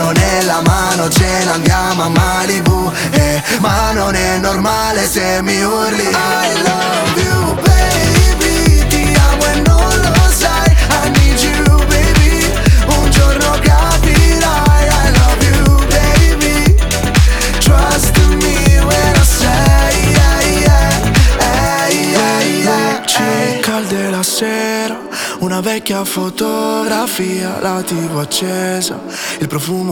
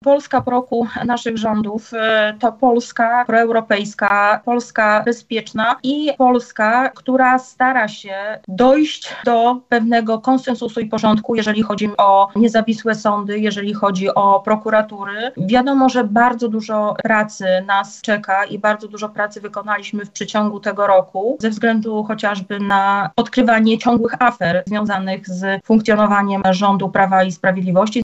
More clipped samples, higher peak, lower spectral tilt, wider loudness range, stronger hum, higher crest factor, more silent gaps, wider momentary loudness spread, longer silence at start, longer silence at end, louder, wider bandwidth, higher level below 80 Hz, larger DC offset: neither; first, 0 dBFS vs -4 dBFS; about the same, -4.5 dB/octave vs -5.5 dB/octave; first, 6 LU vs 3 LU; neither; about the same, 10 dB vs 12 dB; neither; about the same, 7 LU vs 8 LU; about the same, 0 s vs 0.05 s; about the same, 0 s vs 0 s; first, -12 LUFS vs -16 LUFS; first, over 20 kHz vs 8.2 kHz; first, -16 dBFS vs -54 dBFS; neither